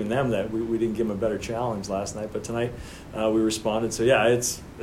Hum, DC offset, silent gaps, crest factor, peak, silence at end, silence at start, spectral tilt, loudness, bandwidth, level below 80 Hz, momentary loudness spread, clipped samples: none; under 0.1%; none; 18 dB; -8 dBFS; 0 s; 0 s; -4.5 dB/octave; -25 LUFS; 16 kHz; -48 dBFS; 10 LU; under 0.1%